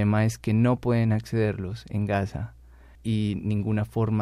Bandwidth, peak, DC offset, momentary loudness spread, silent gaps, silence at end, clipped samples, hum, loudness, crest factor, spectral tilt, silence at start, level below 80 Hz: 12.5 kHz; -10 dBFS; under 0.1%; 10 LU; none; 0 s; under 0.1%; none; -26 LUFS; 14 dB; -8 dB/octave; 0 s; -48 dBFS